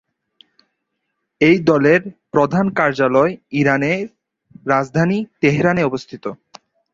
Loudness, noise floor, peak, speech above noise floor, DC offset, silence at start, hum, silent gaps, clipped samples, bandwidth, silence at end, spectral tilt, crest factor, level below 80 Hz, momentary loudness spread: -16 LUFS; -74 dBFS; -2 dBFS; 58 dB; under 0.1%; 1.4 s; none; none; under 0.1%; 7.8 kHz; 0.6 s; -7 dB/octave; 16 dB; -54 dBFS; 13 LU